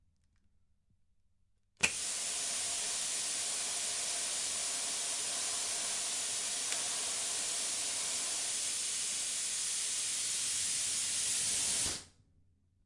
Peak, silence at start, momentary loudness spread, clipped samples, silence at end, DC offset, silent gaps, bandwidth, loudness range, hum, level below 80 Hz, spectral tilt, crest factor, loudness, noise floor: -12 dBFS; 1.8 s; 2 LU; under 0.1%; 0.75 s; under 0.1%; none; 11.5 kHz; 2 LU; none; -70 dBFS; 1.5 dB/octave; 24 dB; -33 LUFS; -72 dBFS